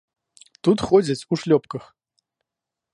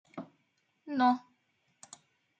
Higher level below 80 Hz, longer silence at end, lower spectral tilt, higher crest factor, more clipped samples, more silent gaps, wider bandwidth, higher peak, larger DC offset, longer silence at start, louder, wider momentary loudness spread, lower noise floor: first, -56 dBFS vs under -90 dBFS; about the same, 1.1 s vs 1.2 s; first, -6.5 dB/octave vs -4.5 dB/octave; about the same, 20 dB vs 20 dB; neither; neither; first, 11.5 kHz vs 9 kHz; first, -4 dBFS vs -16 dBFS; neither; first, 0.65 s vs 0.15 s; first, -21 LUFS vs -30 LUFS; second, 14 LU vs 25 LU; first, -86 dBFS vs -76 dBFS